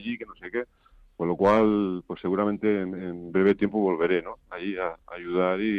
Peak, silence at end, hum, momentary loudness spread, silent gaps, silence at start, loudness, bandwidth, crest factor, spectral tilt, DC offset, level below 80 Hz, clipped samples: -10 dBFS; 0 s; none; 13 LU; none; 0 s; -26 LUFS; 6.6 kHz; 16 dB; -8.5 dB/octave; under 0.1%; -60 dBFS; under 0.1%